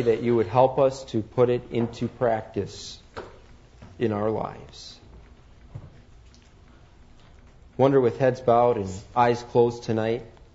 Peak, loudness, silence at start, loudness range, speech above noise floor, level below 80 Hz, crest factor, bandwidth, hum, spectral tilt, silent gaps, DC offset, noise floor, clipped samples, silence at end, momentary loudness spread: -6 dBFS; -24 LUFS; 0 s; 10 LU; 28 dB; -52 dBFS; 20 dB; 8 kHz; none; -7 dB/octave; none; under 0.1%; -51 dBFS; under 0.1%; 0.25 s; 22 LU